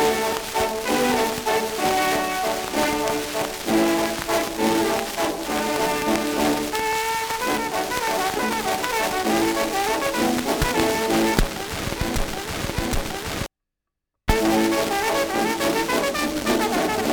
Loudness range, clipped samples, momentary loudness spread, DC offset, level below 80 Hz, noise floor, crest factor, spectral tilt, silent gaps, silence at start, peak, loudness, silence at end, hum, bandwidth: 2 LU; under 0.1%; 6 LU; under 0.1%; -36 dBFS; -83 dBFS; 20 dB; -3.5 dB/octave; none; 0 s; -2 dBFS; -22 LUFS; 0 s; none; over 20 kHz